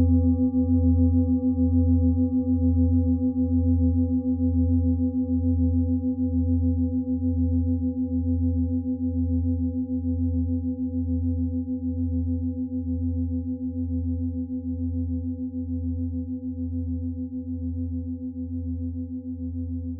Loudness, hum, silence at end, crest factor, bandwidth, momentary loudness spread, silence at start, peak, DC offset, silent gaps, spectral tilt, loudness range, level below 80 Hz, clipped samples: -25 LUFS; none; 0 s; 14 dB; 1.2 kHz; 10 LU; 0 s; -10 dBFS; under 0.1%; none; -18 dB/octave; 8 LU; -40 dBFS; under 0.1%